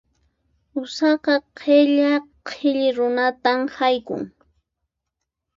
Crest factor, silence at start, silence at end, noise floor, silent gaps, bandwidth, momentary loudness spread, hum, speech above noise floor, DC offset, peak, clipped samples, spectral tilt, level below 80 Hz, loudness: 18 dB; 0.75 s; 1.3 s; -81 dBFS; none; 7.6 kHz; 14 LU; none; 62 dB; under 0.1%; -4 dBFS; under 0.1%; -4.5 dB/octave; -66 dBFS; -20 LUFS